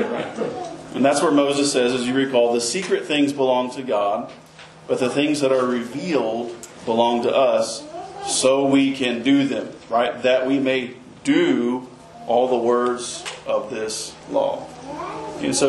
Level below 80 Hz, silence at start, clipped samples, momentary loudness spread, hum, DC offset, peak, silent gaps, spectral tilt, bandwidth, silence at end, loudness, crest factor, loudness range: -60 dBFS; 0 s; under 0.1%; 13 LU; none; under 0.1%; -4 dBFS; none; -4 dB/octave; 12 kHz; 0 s; -21 LUFS; 18 dB; 3 LU